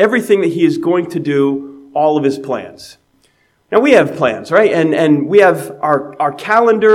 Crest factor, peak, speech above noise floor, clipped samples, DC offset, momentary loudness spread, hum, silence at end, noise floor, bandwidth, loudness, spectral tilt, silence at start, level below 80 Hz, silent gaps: 12 dB; 0 dBFS; 44 dB; 0.1%; under 0.1%; 10 LU; none; 0 s; -57 dBFS; 14.5 kHz; -13 LUFS; -6.5 dB/octave; 0 s; -62 dBFS; none